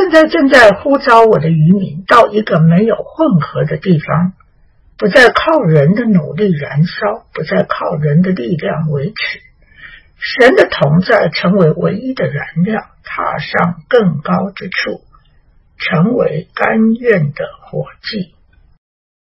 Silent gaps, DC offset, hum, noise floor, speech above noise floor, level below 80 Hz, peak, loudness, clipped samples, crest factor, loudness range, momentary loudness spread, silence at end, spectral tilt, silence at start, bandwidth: none; under 0.1%; none; -48 dBFS; 37 dB; -46 dBFS; 0 dBFS; -12 LUFS; 1%; 12 dB; 5 LU; 13 LU; 0.95 s; -7.5 dB/octave; 0 s; 11 kHz